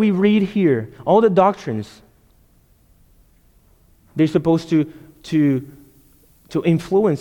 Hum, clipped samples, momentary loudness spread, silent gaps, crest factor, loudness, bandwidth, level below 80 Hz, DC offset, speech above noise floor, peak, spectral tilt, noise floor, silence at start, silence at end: none; under 0.1%; 13 LU; none; 16 dB; -18 LUFS; 17.5 kHz; -54 dBFS; under 0.1%; 38 dB; -2 dBFS; -8 dB/octave; -55 dBFS; 0 s; 0 s